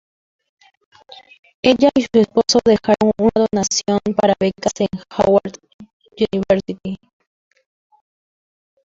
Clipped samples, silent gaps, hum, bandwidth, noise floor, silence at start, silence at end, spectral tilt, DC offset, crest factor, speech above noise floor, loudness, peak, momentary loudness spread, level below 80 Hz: under 0.1%; 5.74-5.79 s, 5.93-6.00 s; none; 7.8 kHz; under -90 dBFS; 1.65 s; 1.95 s; -4.5 dB/octave; under 0.1%; 18 dB; over 74 dB; -17 LUFS; 0 dBFS; 9 LU; -50 dBFS